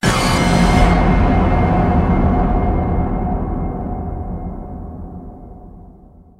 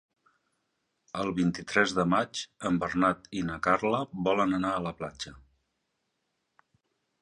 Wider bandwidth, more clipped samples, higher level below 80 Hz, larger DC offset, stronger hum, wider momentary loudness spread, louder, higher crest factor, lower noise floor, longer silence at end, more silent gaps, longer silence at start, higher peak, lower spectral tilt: first, 13.5 kHz vs 10.5 kHz; neither; first, -20 dBFS vs -58 dBFS; neither; neither; first, 18 LU vs 11 LU; first, -16 LUFS vs -29 LUFS; second, 16 dB vs 22 dB; second, -43 dBFS vs -80 dBFS; second, 0.55 s vs 1.85 s; neither; second, 0.05 s vs 1.15 s; first, -2 dBFS vs -10 dBFS; about the same, -6.5 dB/octave vs -5.5 dB/octave